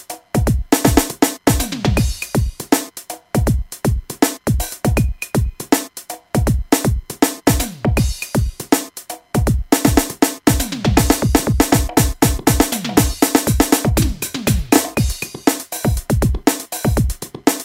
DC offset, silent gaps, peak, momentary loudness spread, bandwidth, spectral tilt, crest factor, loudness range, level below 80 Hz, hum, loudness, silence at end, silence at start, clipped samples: under 0.1%; none; 0 dBFS; 6 LU; 16.5 kHz; -5 dB/octave; 18 dB; 4 LU; -24 dBFS; none; -17 LUFS; 0 s; 0.1 s; under 0.1%